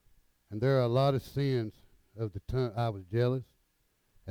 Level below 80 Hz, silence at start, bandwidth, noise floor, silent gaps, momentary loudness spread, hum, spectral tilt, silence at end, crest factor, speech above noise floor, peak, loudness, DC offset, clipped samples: -56 dBFS; 0.5 s; 15.5 kHz; -74 dBFS; none; 13 LU; none; -8 dB/octave; 0 s; 18 dB; 44 dB; -16 dBFS; -31 LUFS; under 0.1%; under 0.1%